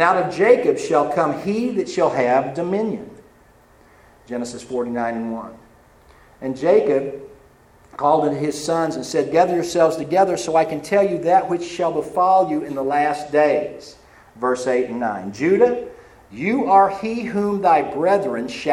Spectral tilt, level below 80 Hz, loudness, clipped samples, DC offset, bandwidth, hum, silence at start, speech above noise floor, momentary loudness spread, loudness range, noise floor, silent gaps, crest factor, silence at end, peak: -5.5 dB/octave; -56 dBFS; -19 LUFS; under 0.1%; under 0.1%; 14.5 kHz; none; 0 s; 33 dB; 12 LU; 6 LU; -51 dBFS; none; 18 dB; 0 s; 0 dBFS